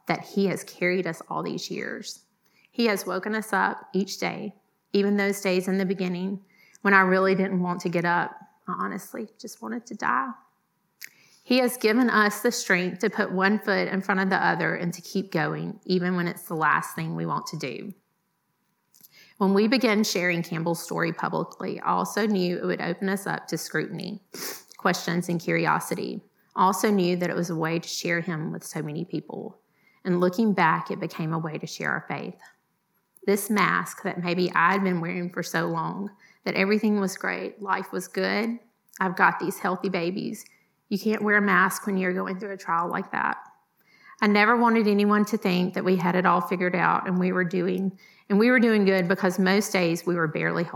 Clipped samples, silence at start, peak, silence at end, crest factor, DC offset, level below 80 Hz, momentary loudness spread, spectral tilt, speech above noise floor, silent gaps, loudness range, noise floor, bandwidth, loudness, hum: under 0.1%; 0.05 s; -4 dBFS; 0 s; 22 dB; under 0.1%; -86 dBFS; 13 LU; -5.5 dB/octave; 49 dB; none; 5 LU; -74 dBFS; 18 kHz; -25 LUFS; none